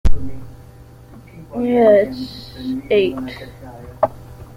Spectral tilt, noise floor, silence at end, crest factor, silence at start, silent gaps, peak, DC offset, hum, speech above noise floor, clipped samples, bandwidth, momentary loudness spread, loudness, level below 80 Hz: -7.5 dB/octave; -41 dBFS; 0.1 s; 16 dB; 0.05 s; none; -2 dBFS; under 0.1%; none; 24 dB; under 0.1%; 11 kHz; 25 LU; -18 LUFS; -28 dBFS